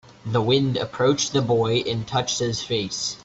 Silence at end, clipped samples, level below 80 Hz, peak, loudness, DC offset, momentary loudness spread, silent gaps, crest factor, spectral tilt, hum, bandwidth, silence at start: 0 s; under 0.1%; -54 dBFS; -6 dBFS; -22 LUFS; under 0.1%; 5 LU; none; 16 dB; -4.5 dB/octave; none; 8.2 kHz; 0.1 s